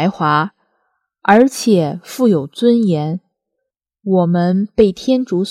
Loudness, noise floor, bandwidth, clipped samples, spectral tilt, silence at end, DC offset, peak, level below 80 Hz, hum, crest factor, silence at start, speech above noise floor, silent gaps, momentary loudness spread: -15 LUFS; -77 dBFS; 15 kHz; under 0.1%; -6.5 dB/octave; 0 s; under 0.1%; 0 dBFS; -50 dBFS; none; 16 dB; 0 s; 63 dB; none; 10 LU